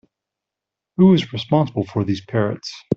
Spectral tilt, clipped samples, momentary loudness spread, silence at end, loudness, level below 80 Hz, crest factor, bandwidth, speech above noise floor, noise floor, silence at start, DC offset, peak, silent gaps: -7.5 dB/octave; under 0.1%; 10 LU; 0 s; -19 LUFS; -56 dBFS; 16 dB; 7 kHz; 67 dB; -85 dBFS; 1 s; under 0.1%; -4 dBFS; none